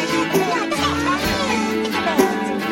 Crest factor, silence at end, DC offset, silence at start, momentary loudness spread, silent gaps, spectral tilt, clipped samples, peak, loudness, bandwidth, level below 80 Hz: 18 dB; 0 s; under 0.1%; 0 s; 2 LU; none; -4 dB/octave; under 0.1%; -2 dBFS; -19 LUFS; 17 kHz; -42 dBFS